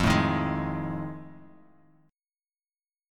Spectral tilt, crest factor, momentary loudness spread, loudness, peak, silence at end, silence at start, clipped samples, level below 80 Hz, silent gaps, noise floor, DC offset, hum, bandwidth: -6 dB/octave; 20 dB; 19 LU; -29 LUFS; -10 dBFS; 1.7 s; 0 s; under 0.1%; -46 dBFS; none; under -90 dBFS; under 0.1%; none; 16.5 kHz